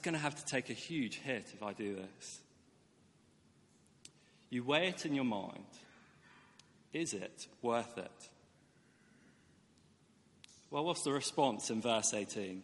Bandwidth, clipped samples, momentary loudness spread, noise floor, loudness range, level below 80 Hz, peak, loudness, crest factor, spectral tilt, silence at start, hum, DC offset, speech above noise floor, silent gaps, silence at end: 11.5 kHz; under 0.1%; 24 LU; -69 dBFS; 9 LU; -82 dBFS; -16 dBFS; -38 LUFS; 24 dB; -3.5 dB/octave; 0 s; none; under 0.1%; 30 dB; none; 0 s